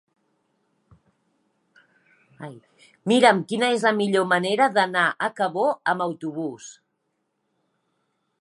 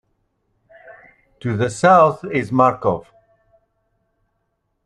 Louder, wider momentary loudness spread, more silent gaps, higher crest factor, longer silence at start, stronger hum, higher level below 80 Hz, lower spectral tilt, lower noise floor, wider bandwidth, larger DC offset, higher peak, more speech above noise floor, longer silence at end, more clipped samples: second, -22 LUFS vs -17 LUFS; first, 23 LU vs 14 LU; neither; about the same, 22 dB vs 20 dB; first, 2.4 s vs 0.9 s; neither; second, -76 dBFS vs -56 dBFS; second, -4.5 dB/octave vs -6.5 dB/octave; first, -75 dBFS vs -71 dBFS; about the same, 11.5 kHz vs 11.5 kHz; neither; about the same, -2 dBFS vs -2 dBFS; about the same, 53 dB vs 55 dB; second, 1.7 s vs 1.85 s; neither